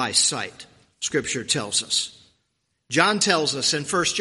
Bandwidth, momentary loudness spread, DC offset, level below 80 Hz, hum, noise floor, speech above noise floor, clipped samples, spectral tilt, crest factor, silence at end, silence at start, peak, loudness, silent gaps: 11.5 kHz; 11 LU; under 0.1%; -62 dBFS; none; -74 dBFS; 51 dB; under 0.1%; -1.5 dB/octave; 24 dB; 0 s; 0 s; 0 dBFS; -22 LUFS; none